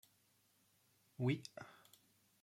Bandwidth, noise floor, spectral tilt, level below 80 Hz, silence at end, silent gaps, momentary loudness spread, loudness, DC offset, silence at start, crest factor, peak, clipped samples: 16 kHz; -76 dBFS; -6.5 dB/octave; -84 dBFS; 0.7 s; none; 23 LU; -43 LUFS; under 0.1%; 1.2 s; 22 dB; -26 dBFS; under 0.1%